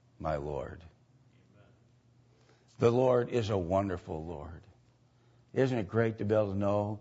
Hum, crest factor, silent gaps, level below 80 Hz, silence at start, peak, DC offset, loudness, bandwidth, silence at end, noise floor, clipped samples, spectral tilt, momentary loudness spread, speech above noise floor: none; 20 dB; none; -56 dBFS; 0.2 s; -12 dBFS; under 0.1%; -31 LUFS; 8 kHz; 0 s; -65 dBFS; under 0.1%; -8 dB/octave; 17 LU; 35 dB